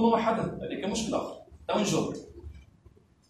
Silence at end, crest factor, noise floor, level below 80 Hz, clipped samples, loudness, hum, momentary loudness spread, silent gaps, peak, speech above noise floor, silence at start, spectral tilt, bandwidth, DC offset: 0.65 s; 20 dB; -59 dBFS; -54 dBFS; under 0.1%; -30 LUFS; none; 18 LU; none; -12 dBFS; 30 dB; 0 s; -5 dB/octave; 14 kHz; under 0.1%